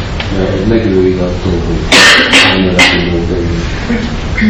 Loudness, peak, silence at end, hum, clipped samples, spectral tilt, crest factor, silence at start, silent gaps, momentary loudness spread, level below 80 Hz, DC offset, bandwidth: -8 LUFS; 0 dBFS; 0 s; none; 2%; -4 dB/octave; 10 dB; 0 s; none; 12 LU; -22 dBFS; under 0.1%; 11 kHz